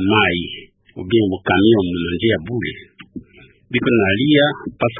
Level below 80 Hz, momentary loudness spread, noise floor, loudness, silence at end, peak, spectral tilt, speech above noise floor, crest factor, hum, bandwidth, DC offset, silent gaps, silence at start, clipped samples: -42 dBFS; 23 LU; -47 dBFS; -17 LUFS; 0 s; -2 dBFS; -11.5 dB/octave; 31 dB; 16 dB; none; 3.8 kHz; under 0.1%; none; 0 s; under 0.1%